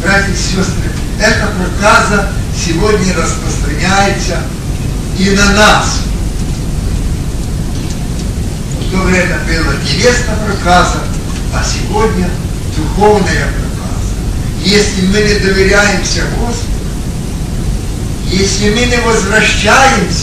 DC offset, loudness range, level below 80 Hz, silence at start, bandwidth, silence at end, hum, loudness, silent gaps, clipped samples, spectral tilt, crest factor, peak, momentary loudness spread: under 0.1%; 3 LU; -18 dBFS; 0 s; 14.5 kHz; 0 s; none; -12 LUFS; none; 0.3%; -4.5 dB/octave; 10 dB; 0 dBFS; 10 LU